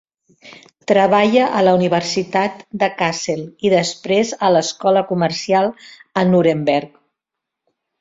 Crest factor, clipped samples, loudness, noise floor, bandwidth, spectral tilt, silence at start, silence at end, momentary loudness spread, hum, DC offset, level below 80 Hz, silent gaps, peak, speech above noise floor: 16 dB; under 0.1%; -17 LUFS; -82 dBFS; 7.8 kHz; -5 dB/octave; 0.45 s; 1.15 s; 8 LU; none; under 0.1%; -60 dBFS; none; -2 dBFS; 65 dB